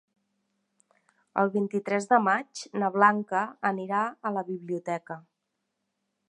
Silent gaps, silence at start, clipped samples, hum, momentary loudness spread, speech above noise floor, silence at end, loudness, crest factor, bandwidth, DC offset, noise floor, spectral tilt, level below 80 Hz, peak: none; 1.35 s; under 0.1%; none; 12 LU; 54 dB; 1.1 s; -27 LUFS; 24 dB; 10.5 kHz; under 0.1%; -81 dBFS; -5.5 dB/octave; -84 dBFS; -6 dBFS